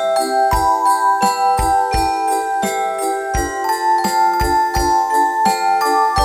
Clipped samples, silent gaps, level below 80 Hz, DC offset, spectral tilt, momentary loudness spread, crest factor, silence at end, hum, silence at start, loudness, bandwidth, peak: under 0.1%; none; -30 dBFS; under 0.1%; -3.5 dB/octave; 5 LU; 12 dB; 0 s; none; 0 s; -16 LUFS; 17 kHz; -2 dBFS